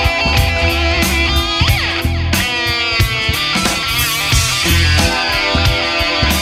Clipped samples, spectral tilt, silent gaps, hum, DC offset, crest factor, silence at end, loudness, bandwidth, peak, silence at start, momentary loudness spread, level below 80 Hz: under 0.1%; -3.5 dB/octave; none; none; under 0.1%; 14 dB; 0 s; -13 LUFS; 16.5 kHz; -2 dBFS; 0 s; 3 LU; -22 dBFS